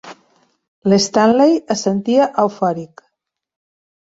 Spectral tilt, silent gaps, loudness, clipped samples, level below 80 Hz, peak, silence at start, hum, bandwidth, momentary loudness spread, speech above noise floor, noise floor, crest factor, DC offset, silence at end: -5 dB/octave; 0.68-0.82 s; -15 LUFS; under 0.1%; -60 dBFS; -2 dBFS; 0.05 s; none; 8 kHz; 9 LU; 59 dB; -73 dBFS; 16 dB; under 0.1%; 1.3 s